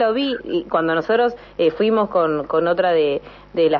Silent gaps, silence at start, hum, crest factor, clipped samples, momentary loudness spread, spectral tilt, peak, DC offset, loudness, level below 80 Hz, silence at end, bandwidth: none; 0 s; 50 Hz at -50 dBFS; 14 dB; under 0.1%; 5 LU; -7.5 dB/octave; -6 dBFS; under 0.1%; -19 LUFS; -52 dBFS; 0 s; 5.8 kHz